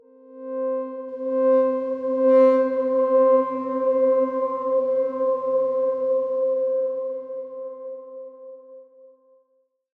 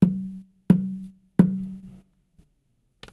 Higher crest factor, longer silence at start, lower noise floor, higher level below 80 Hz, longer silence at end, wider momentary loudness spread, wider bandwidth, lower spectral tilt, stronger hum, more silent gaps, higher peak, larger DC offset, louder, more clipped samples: second, 16 dB vs 22 dB; first, 0.3 s vs 0 s; about the same, -68 dBFS vs -69 dBFS; second, -80 dBFS vs -54 dBFS; about the same, 1.15 s vs 1.15 s; about the same, 18 LU vs 18 LU; second, 3.3 kHz vs 11.5 kHz; second, -7.5 dB/octave vs -10 dB/octave; neither; neither; second, -8 dBFS vs -2 dBFS; neither; about the same, -22 LUFS vs -23 LUFS; neither